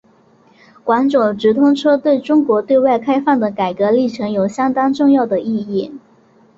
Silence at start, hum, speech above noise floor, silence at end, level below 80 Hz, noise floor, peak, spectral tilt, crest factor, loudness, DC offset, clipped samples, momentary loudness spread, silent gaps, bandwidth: 0.85 s; none; 36 dB; 0.6 s; -58 dBFS; -51 dBFS; -2 dBFS; -7 dB/octave; 14 dB; -15 LUFS; under 0.1%; under 0.1%; 7 LU; none; 7.8 kHz